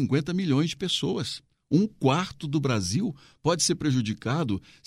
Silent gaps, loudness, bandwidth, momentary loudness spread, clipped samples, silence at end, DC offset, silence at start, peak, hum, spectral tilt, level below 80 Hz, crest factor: none; -26 LUFS; 15 kHz; 7 LU; under 0.1%; 0.25 s; under 0.1%; 0 s; -10 dBFS; none; -5 dB/octave; -58 dBFS; 18 dB